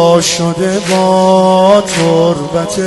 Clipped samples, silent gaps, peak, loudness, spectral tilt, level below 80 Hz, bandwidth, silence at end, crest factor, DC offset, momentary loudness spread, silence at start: under 0.1%; none; 0 dBFS; -10 LUFS; -4.5 dB/octave; -44 dBFS; 12 kHz; 0 s; 10 dB; under 0.1%; 6 LU; 0 s